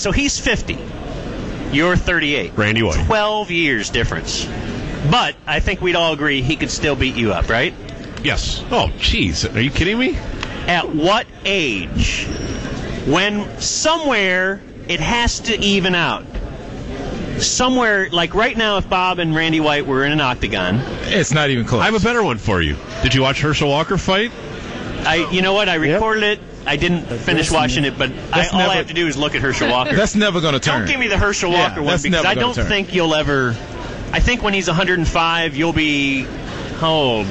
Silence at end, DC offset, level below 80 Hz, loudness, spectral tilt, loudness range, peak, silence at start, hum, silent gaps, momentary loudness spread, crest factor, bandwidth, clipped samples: 0 s; under 0.1%; -30 dBFS; -17 LUFS; -4 dB/octave; 2 LU; -4 dBFS; 0 s; none; none; 10 LU; 14 dB; 8.4 kHz; under 0.1%